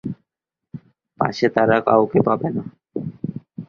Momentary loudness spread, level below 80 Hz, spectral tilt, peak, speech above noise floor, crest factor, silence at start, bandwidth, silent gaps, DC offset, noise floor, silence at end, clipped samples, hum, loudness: 24 LU; -56 dBFS; -7.5 dB/octave; -2 dBFS; 66 dB; 20 dB; 0.05 s; 7.2 kHz; none; under 0.1%; -84 dBFS; 0.05 s; under 0.1%; none; -20 LUFS